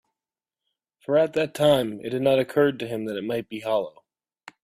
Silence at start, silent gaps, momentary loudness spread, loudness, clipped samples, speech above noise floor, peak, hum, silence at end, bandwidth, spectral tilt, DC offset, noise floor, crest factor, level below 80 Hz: 1.1 s; none; 9 LU; -24 LUFS; under 0.1%; over 67 dB; -6 dBFS; none; 0.75 s; 15.5 kHz; -6 dB/octave; under 0.1%; under -90 dBFS; 18 dB; -64 dBFS